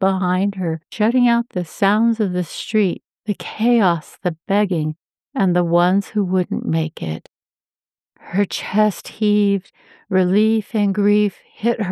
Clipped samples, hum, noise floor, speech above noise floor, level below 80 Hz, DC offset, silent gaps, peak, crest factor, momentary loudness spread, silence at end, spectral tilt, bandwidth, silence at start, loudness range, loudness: under 0.1%; none; under -90 dBFS; over 72 dB; -70 dBFS; under 0.1%; none; -4 dBFS; 14 dB; 10 LU; 0 s; -7 dB/octave; 13.5 kHz; 0 s; 3 LU; -19 LUFS